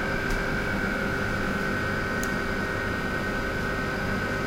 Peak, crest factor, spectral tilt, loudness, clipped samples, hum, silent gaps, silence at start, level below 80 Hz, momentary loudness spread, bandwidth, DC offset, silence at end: -14 dBFS; 14 dB; -5 dB/octave; -28 LUFS; under 0.1%; none; none; 0 s; -38 dBFS; 1 LU; 16 kHz; under 0.1%; 0 s